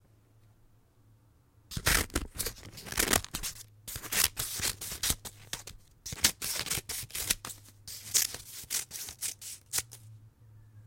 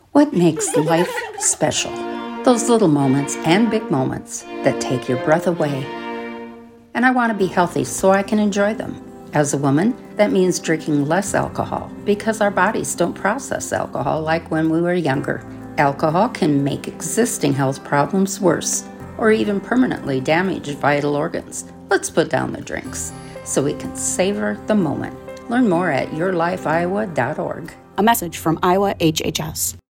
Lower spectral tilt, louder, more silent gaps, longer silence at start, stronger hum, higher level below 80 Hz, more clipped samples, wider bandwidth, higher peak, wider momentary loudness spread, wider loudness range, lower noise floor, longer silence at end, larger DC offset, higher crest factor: second, -1 dB/octave vs -4.5 dB/octave; second, -32 LUFS vs -19 LUFS; neither; first, 1.7 s vs 0.15 s; neither; about the same, -48 dBFS vs -50 dBFS; neither; about the same, 17 kHz vs 17 kHz; second, -4 dBFS vs 0 dBFS; first, 16 LU vs 11 LU; about the same, 3 LU vs 3 LU; first, -63 dBFS vs -39 dBFS; about the same, 0 s vs 0.1 s; neither; first, 30 dB vs 18 dB